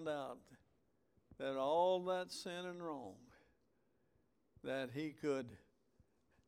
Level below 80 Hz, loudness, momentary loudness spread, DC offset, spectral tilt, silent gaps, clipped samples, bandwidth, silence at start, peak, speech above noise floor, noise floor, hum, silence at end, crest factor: -80 dBFS; -42 LUFS; 16 LU; under 0.1%; -5 dB/octave; none; under 0.1%; 15.5 kHz; 0 s; -24 dBFS; 38 dB; -80 dBFS; none; 0.9 s; 20 dB